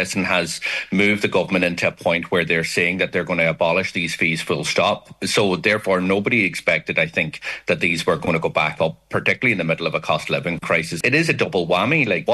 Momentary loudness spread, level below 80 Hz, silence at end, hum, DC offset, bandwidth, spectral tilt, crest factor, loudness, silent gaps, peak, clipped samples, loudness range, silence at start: 5 LU; -54 dBFS; 0 s; none; under 0.1%; 12.5 kHz; -4.5 dB/octave; 18 dB; -19 LUFS; none; -2 dBFS; under 0.1%; 1 LU; 0 s